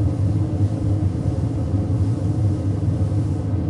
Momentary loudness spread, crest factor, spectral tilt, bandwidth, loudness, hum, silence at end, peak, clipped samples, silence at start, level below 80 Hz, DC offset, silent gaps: 2 LU; 10 dB; -9.5 dB/octave; 10.5 kHz; -22 LUFS; none; 0 s; -10 dBFS; under 0.1%; 0 s; -36 dBFS; under 0.1%; none